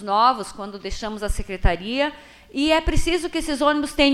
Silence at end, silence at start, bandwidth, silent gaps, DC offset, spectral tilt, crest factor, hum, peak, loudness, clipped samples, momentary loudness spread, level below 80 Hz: 0 s; 0 s; 14 kHz; none; under 0.1%; -4.5 dB/octave; 18 dB; none; -4 dBFS; -23 LUFS; under 0.1%; 12 LU; -28 dBFS